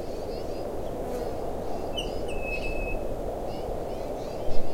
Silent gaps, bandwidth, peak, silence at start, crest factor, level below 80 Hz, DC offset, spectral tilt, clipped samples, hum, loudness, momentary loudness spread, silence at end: none; 15.5 kHz; -8 dBFS; 0 s; 18 dB; -36 dBFS; under 0.1%; -5.5 dB/octave; under 0.1%; none; -33 LUFS; 3 LU; 0 s